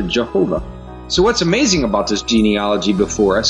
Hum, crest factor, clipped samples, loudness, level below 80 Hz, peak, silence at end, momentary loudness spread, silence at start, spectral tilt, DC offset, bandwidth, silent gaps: none; 14 dB; under 0.1%; -16 LUFS; -34 dBFS; -2 dBFS; 0 s; 6 LU; 0 s; -4 dB/octave; under 0.1%; 10.5 kHz; none